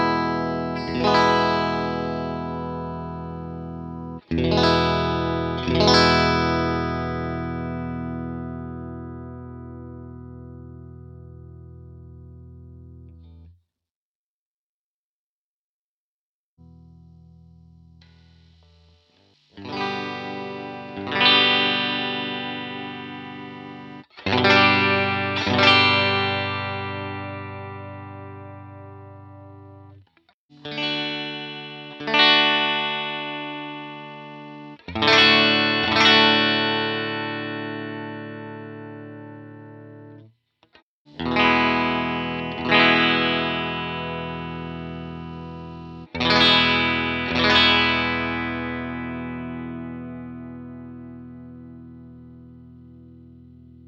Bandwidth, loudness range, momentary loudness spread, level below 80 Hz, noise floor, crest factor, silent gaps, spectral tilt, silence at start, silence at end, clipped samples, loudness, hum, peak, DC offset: 8.8 kHz; 19 LU; 24 LU; -46 dBFS; under -90 dBFS; 22 dB; 13.91-16.57 s, 30.34-30.49 s, 40.82-41.05 s; -5 dB/octave; 0 s; 0.05 s; under 0.1%; -20 LUFS; none; -2 dBFS; under 0.1%